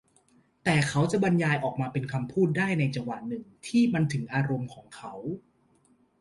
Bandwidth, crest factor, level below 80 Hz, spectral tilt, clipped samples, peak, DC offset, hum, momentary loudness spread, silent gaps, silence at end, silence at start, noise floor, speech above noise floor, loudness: 11.5 kHz; 18 dB; -62 dBFS; -6.5 dB/octave; under 0.1%; -12 dBFS; under 0.1%; none; 14 LU; none; 0.85 s; 0.65 s; -65 dBFS; 38 dB; -28 LUFS